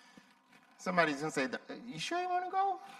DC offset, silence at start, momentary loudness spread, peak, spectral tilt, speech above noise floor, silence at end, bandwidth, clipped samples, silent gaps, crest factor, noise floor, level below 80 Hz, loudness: under 0.1%; 0.8 s; 12 LU; -14 dBFS; -4 dB/octave; 29 dB; 0 s; 14 kHz; under 0.1%; none; 22 dB; -64 dBFS; -82 dBFS; -35 LUFS